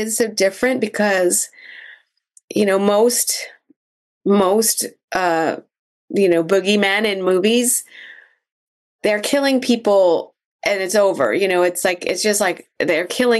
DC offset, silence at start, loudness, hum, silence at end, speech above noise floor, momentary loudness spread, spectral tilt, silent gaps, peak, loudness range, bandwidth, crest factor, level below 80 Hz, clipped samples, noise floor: under 0.1%; 0 s; -17 LUFS; none; 0 s; 38 dB; 9 LU; -3 dB/octave; 2.44-2.48 s, 3.76-4.21 s, 5.04-5.08 s, 5.79-6.08 s, 8.52-8.99 s, 10.45-10.59 s; -4 dBFS; 2 LU; 13 kHz; 14 dB; -64 dBFS; under 0.1%; -55 dBFS